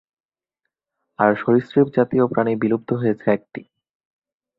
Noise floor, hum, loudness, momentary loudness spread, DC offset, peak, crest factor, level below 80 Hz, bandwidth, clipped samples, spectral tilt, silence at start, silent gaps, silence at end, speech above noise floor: -81 dBFS; none; -19 LUFS; 6 LU; under 0.1%; -2 dBFS; 20 dB; -62 dBFS; 5.2 kHz; under 0.1%; -10.5 dB/octave; 1.2 s; none; 1 s; 62 dB